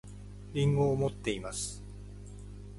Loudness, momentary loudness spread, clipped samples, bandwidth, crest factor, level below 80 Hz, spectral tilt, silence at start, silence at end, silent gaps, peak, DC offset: -32 LUFS; 20 LU; under 0.1%; 11.5 kHz; 16 dB; -48 dBFS; -5.5 dB/octave; 0.05 s; 0 s; none; -16 dBFS; under 0.1%